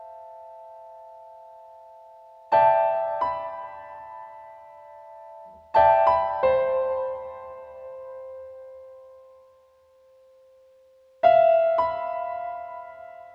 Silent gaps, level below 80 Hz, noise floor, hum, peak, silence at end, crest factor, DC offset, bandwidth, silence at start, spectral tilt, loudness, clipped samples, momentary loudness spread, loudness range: none; -60 dBFS; -58 dBFS; none; -6 dBFS; 0.1 s; 20 dB; under 0.1%; 5.4 kHz; 0 s; -6 dB/octave; -22 LUFS; under 0.1%; 27 LU; 15 LU